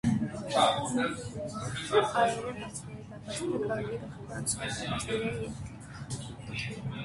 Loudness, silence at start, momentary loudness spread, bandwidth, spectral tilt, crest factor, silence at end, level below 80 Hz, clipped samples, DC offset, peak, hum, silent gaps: -32 LUFS; 0.05 s; 14 LU; 12 kHz; -4.5 dB/octave; 20 dB; 0 s; -54 dBFS; under 0.1%; under 0.1%; -12 dBFS; none; none